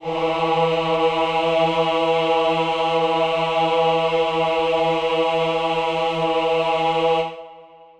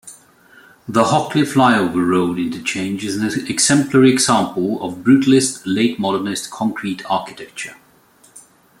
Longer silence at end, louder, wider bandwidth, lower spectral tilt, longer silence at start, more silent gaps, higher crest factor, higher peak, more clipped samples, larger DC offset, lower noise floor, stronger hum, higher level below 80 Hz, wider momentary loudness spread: about the same, 0.35 s vs 0.4 s; second, -20 LUFS vs -17 LUFS; second, 9.2 kHz vs 15.5 kHz; about the same, -5.5 dB/octave vs -4.5 dB/octave; about the same, 0 s vs 0.05 s; neither; about the same, 14 dB vs 16 dB; second, -6 dBFS vs -2 dBFS; neither; neither; second, -44 dBFS vs -51 dBFS; neither; about the same, -54 dBFS vs -58 dBFS; second, 2 LU vs 11 LU